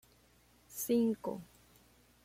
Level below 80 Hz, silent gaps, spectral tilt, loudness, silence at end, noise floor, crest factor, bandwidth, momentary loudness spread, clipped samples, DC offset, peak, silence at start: -72 dBFS; none; -5.5 dB/octave; -35 LUFS; 0.8 s; -67 dBFS; 18 dB; 16.5 kHz; 17 LU; under 0.1%; under 0.1%; -22 dBFS; 0.7 s